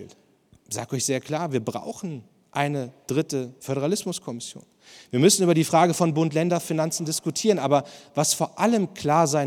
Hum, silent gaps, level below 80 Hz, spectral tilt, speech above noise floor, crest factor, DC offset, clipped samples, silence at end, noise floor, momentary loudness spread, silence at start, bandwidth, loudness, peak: none; none; -70 dBFS; -4.5 dB/octave; 35 dB; 20 dB; under 0.1%; under 0.1%; 0 s; -59 dBFS; 14 LU; 0 s; 17.5 kHz; -24 LUFS; -4 dBFS